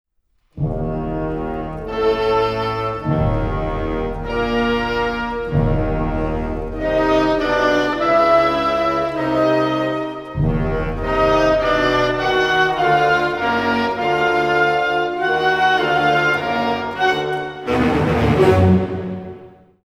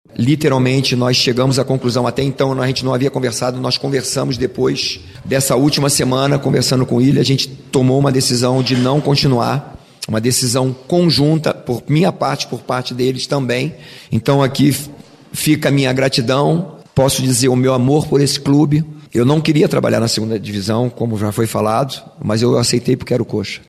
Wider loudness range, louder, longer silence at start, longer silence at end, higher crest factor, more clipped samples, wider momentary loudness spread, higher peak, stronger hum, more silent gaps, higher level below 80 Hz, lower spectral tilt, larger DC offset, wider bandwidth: about the same, 4 LU vs 3 LU; second, -18 LUFS vs -15 LUFS; first, 0.55 s vs 0.15 s; first, 0.35 s vs 0.1 s; about the same, 16 dB vs 14 dB; neither; about the same, 9 LU vs 7 LU; about the same, -2 dBFS vs -2 dBFS; neither; neither; first, -32 dBFS vs -46 dBFS; first, -6.5 dB/octave vs -5 dB/octave; neither; first, 16 kHz vs 14.5 kHz